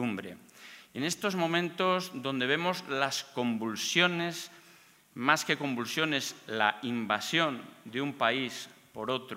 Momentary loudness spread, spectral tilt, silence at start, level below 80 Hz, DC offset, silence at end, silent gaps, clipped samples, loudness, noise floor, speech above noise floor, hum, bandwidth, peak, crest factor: 15 LU; -3.5 dB/octave; 0 s; -80 dBFS; under 0.1%; 0 s; none; under 0.1%; -30 LUFS; -59 dBFS; 28 dB; none; 16 kHz; -8 dBFS; 24 dB